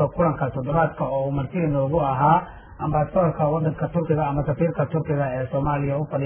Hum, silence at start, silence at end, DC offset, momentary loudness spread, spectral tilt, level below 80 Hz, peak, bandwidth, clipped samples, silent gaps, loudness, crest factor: none; 0 s; 0 s; under 0.1%; 5 LU; -12.5 dB/octave; -42 dBFS; -6 dBFS; 3.5 kHz; under 0.1%; none; -23 LUFS; 16 dB